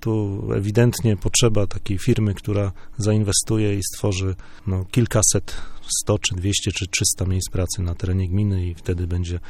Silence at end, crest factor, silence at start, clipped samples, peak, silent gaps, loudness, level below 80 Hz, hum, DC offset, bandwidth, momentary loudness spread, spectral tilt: 0 s; 18 dB; 0 s; under 0.1%; -4 dBFS; none; -21 LUFS; -36 dBFS; none; under 0.1%; 16.5 kHz; 8 LU; -4.5 dB/octave